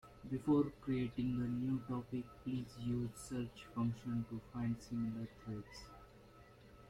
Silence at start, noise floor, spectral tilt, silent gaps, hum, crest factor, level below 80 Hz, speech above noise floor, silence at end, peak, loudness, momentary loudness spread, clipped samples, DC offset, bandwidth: 0.05 s; -61 dBFS; -7.5 dB/octave; none; none; 18 dB; -62 dBFS; 21 dB; 0 s; -22 dBFS; -41 LUFS; 20 LU; under 0.1%; under 0.1%; 14 kHz